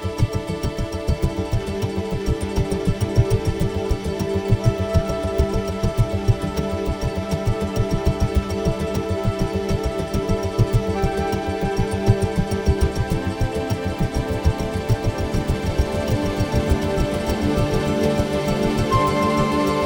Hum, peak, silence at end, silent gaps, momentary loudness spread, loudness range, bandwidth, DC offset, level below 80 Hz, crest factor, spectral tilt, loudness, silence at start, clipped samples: none; -2 dBFS; 0 s; none; 5 LU; 2 LU; 19.5 kHz; under 0.1%; -28 dBFS; 18 dB; -6.5 dB/octave; -22 LUFS; 0 s; under 0.1%